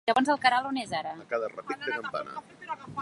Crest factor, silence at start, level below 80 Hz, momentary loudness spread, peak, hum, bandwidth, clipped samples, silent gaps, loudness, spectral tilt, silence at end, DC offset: 22 dB; 0.05 s; -70 dBFS; 16 LU; -8 dBFS; none; 11.5 kHz; under 0.1%; none; -29 LUFS; -4 dB/octave; 0 s; under 0.1%